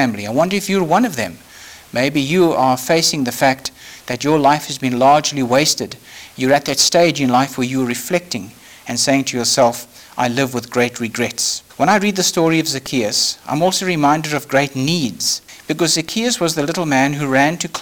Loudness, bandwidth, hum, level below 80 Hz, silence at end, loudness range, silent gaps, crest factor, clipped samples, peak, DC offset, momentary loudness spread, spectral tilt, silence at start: -16 LUFS; over 20 kHz; none; -56 dBFS; 0 s; 3 LU; none; 14 dB; under 0.1%; -2 dBFS; under 0.1%; 11 LU; -3.5 dB/octave; 0 s